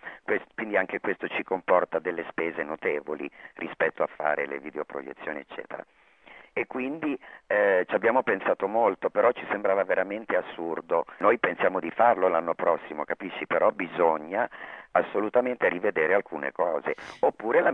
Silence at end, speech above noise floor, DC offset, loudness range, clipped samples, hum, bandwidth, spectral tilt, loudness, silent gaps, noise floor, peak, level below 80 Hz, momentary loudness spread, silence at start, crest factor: 0 s; 26 dB; under 0.1%; 7 LU; under 0.1%; none; 6.2 kHz; -7 dB/octave; -27 LUFS; none; -52 dBFS; -6 dBFS; -70 dBFS; 12 LU; 0 s; 22 dB